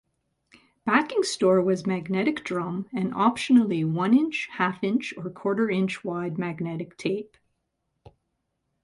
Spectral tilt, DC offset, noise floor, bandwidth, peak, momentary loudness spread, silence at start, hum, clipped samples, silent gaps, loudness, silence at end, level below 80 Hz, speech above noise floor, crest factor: -6 dB/octave; under 0.1%; -78 dBFS; 11.5 kHz; -6 dBFS; 10 LU; 0.85 s; none; under 0.1%; none; -25 LUFS; 1.6 s; -66 dBFS; 53 dB; 20 dB